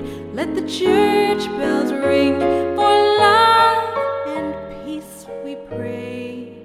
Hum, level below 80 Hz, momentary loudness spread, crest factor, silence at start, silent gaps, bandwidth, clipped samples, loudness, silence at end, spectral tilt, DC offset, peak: none; -50 dBFS; 18 LU; 16 dB; 0 s; none; 15 kHz; under 0.1%; -17 LUFS; 0 s; -4.5 dB/octave; under 0.1%; -2 dBFS